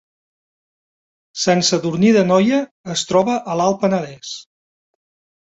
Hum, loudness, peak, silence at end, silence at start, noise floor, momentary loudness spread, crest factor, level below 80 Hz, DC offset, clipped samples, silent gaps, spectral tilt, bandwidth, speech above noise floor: none; -17 LUFS; -2 dBFS; 1 s; 1.35 s; under -90 dBFS; 16 LU; 16 dB; -60 dBFS; under 0.1%; under 0.1%; 2.71-2.84 s; -4.5 dB/octave; 8 kHz; over 73 dB